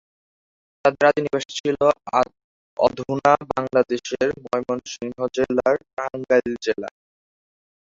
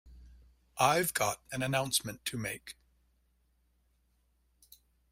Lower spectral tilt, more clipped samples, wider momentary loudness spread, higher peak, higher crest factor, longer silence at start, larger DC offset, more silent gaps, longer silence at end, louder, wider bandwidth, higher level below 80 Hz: first, -5 dB/octave vs -3 dB/octave; neither; second, 9 LU vs 15 LU; first, -2 dBFS vs -12 dBFS; about the same, 20 dB vs 24 dB; first, 0.85 s vs 0.05 s; neither; first, 1.60-1.64 s, 2.44-2.77 s, 5.93-5.97 s vs none; second, 0.95 s vs 2.4 s; first, -22 LUFS vs -32 LUFS; second, 7.8 kHz vs 16 kHz; about the same, -58 dBFS vs -62 dBFS